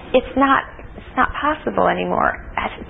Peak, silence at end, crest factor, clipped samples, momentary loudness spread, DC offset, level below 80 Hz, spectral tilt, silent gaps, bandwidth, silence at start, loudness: -2 dBFS; 0 s; 18 dB; under 0.1%; 10 LU; under 0.1%; -38 dBFS; -9 dB/octave; none; 3.9 kHz; 0 s; -19 LUFS